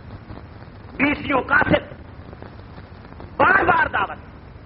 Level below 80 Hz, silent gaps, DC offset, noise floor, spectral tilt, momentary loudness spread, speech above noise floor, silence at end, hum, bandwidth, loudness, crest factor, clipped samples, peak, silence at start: -42 dBFS; none; under 0.1%; -39 dBFS; -3.5 dB/octave; 25 LU; 19 dB; 0 s; none; 5.6 kHz; -19 LUFS; 20 dB; under 0.1%; -4 dBFS; 0.05 s